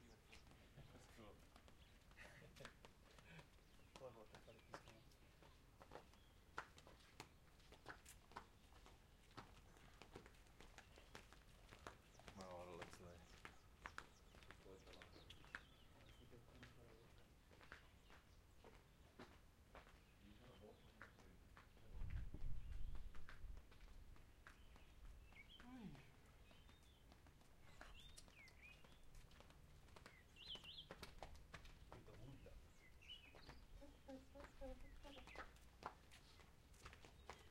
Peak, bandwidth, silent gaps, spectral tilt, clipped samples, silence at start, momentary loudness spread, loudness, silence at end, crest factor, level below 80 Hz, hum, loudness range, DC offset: -32 dBFS; 16 kHz; none; -4.5 dB/octave; under 0.1%; 0 s; 11 LU; -63 LUFS; 0 s; 26 dB; -64 dBFS; none; 6 LU; under 0.1%